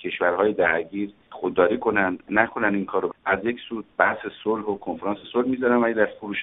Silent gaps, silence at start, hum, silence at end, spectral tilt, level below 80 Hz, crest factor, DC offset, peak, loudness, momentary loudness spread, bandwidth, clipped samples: none; 0 s; none; 0 s; -3.5 dB/octave; -58 dBFS; 22 dB; under 0.1%; -2 dBFS; -23 LUFS; 9 LU; 4 kHz; under 0.1%